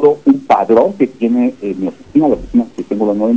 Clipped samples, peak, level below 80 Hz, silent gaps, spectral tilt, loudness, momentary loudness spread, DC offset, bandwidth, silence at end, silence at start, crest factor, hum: under 0.1%; 0 dBFS; -42 dBFS; none; -8.5 dB/octave; -14 LUFS; 9 LU; 0.4%; 8 kHz; 0 s; 0 s; 12 dB; none